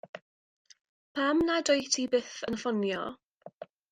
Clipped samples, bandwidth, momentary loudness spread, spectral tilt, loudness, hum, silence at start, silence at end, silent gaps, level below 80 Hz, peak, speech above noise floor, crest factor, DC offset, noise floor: under 0.1%; 10.5 kHz; 22 LU; -3 dB/octave; -29 LUFS; none; 0.15 s; 0.3 s; 0.22-0.65 s, 0.89-1.15 s, 3.26-3.35 s, 3.54-3.58 s; -64 dBFS; -12 dBFS; 20 dB; 20 dB; under 0.1%; -49 dBFS